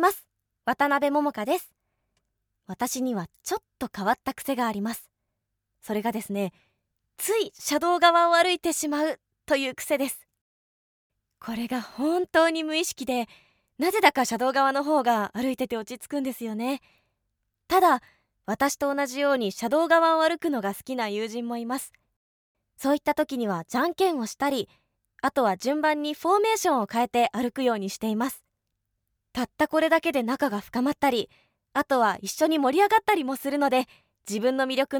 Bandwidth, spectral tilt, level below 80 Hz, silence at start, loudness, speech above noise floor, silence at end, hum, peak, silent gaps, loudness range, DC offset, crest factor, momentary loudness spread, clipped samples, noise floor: over 20 kHz; -3.5 dB/octave; -66 dBFS; 0 s; -25 LUFS; 56 dB; 0 s; none; -4 dBFS; 10.41-11.10 s, 22.16-22.55 s; 6 LU; under 0.1%; 22 dB; 12 LU; under 0.1%; -81 dBFS